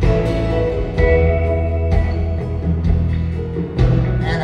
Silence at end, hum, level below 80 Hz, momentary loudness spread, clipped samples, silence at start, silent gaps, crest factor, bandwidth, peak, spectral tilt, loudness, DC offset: 0 s; none; -20 dBFS; 6 LU; under 0.1%; 0 s; none; 14 dB; 6.4 kHz; -2 dBFS; -9 dB/octave; -18 LUFS; under 0.1%